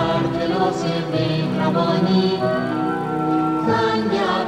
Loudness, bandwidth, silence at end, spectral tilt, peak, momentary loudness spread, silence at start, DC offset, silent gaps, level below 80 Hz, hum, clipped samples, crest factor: -20 LUFS; 11 kHz; 0 s; -7 dB/octave; -6 dBFS; 4 LU; 0 s; under 0.1%; none; -50 dBFS; none; under 0.1%; 12 dB